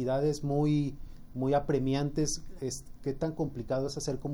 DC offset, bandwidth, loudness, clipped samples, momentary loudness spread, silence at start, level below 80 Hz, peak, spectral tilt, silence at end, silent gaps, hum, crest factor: under 0.1%; over 20 kHz; -32 LUFS; under 0.1%; 10 LU; 0 s; -46 dBFS; -16 dBFS; -6 dB/octave; 0 s; none; none; 16 dB